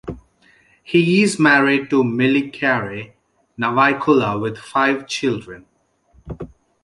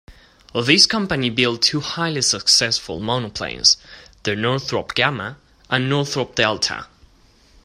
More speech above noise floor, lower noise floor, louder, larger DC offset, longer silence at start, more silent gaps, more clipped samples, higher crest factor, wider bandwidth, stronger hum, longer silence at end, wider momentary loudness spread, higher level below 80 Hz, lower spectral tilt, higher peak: first, 39 dB vs 33 dB; about the same, -56 dBFS vs -53 dBFS; about the same, -17 LUFS vs -18 LUFS; neither; about the same, 0.05 s vs 0.1 s; neither; neither; about the same, 18 dB vs 20 dB; second, 11.5 kHz vs 14.5 kHz; neither; second, 0.4 s vs 0.8 s; first, 21 LU vs 11 LU; about the same, -50 dBFS vs -50 dBFS; first, -5.5 dB/octave vs -2.5 dB/octave; about the same, -2 dBFS vs 0 dBFS